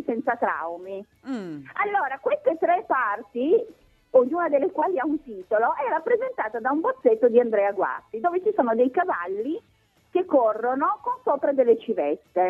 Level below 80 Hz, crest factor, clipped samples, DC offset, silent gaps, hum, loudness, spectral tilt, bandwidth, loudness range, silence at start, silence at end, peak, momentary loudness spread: -70 dBFS; 18 dB; under 0.1%; under 0.1%; none; none; -24 LUFS; -7.5 dB/octave; 4.6 kHz; 3 LU; 0 s; 0 s; -6 dBFS; 11 LU